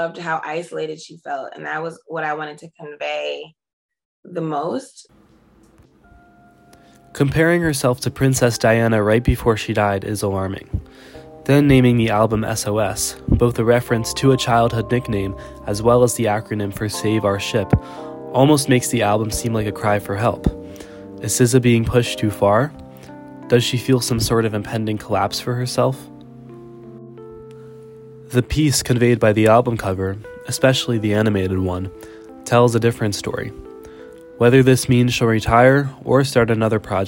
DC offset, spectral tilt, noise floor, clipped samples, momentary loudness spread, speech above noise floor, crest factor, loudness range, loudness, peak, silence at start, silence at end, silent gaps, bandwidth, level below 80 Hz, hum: under 0.1%; -5.5 dB/octave; -52 dBFS; under 0.1%; 18 LU; 34 dB; 18 dB; 10 LU; -18 LUFS; 0 dBFS; 0 s; 0 s; 3.73-3.89 s, 4.05-4.23 s; 16.5 kHz; -38 dBFS; none